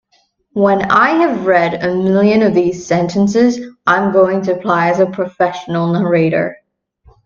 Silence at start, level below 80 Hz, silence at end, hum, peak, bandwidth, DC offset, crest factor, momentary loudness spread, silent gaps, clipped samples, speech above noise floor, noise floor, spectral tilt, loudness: 0.55 s; -52 dBFS; 0.7 s; none; 0 dBFS; 7.4 kHz; under 0.1%; 14 dB; 6 LU; none; under 0.1%; 46 dB; -59 dBFS; -7 dB/octave; -14 LUFS